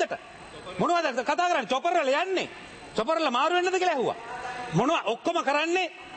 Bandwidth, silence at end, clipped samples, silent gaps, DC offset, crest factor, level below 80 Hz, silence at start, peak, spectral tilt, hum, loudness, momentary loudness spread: 8.8 kHz; 0 s; under 0.1%; none; under 0.1%; 16 dB; -64 dBFS; 0 s; -12 dBFS; -4.5 dB/octave; none; -26 LUFS; 12 LU